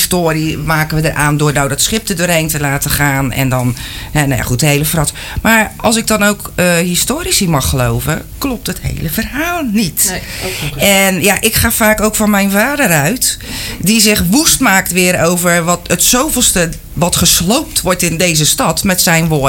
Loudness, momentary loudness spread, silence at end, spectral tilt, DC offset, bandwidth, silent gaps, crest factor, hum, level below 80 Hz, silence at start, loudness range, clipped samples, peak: -11 LUFS; 9 LU; 0 s; -3.5 dB/octave; under 0.1%; 17.5 kHz; none; 12 dB; none; -28 dBFS; 0 s; 4 LU; under 0.1%; 0 dBFS